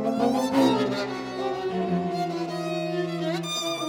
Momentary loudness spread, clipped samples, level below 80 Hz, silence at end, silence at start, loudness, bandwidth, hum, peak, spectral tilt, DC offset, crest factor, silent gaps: 8 LU; under 0.1%; -64 dBFS; 0 s; 0 s; -26 LUFS; 18.5 kHz; none; -10 dBFS; -5 dB/octave; under 0.1%; 16 dB; none